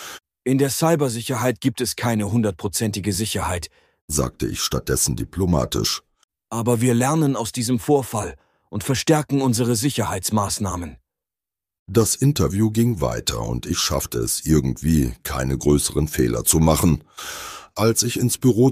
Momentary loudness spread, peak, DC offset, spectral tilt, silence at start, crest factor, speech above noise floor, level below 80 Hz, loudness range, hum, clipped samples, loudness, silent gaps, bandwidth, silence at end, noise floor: 9 LU; -2 dBFS; under 0.1%; -5 dB/octave; 0 s; 20 dB; 69 dB; -36 dBFS; 3 LU; none; under 0.1%; -21 LUFS; 4.01-4.08 s, 6.24-6.28 s, 11.79-11.86 s; 15.5 kHz; 0 s; -89 dBFS